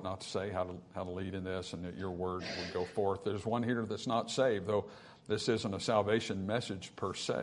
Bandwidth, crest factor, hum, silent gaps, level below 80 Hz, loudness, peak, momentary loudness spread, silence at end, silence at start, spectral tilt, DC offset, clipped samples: 11 kHz; 20 dB; none; none; -70 dBFS; -36 LUFS; -16 dBFS; 9 LU; 0 s; 0 s; -5 dB/octave; under 0.1%; under 0.1%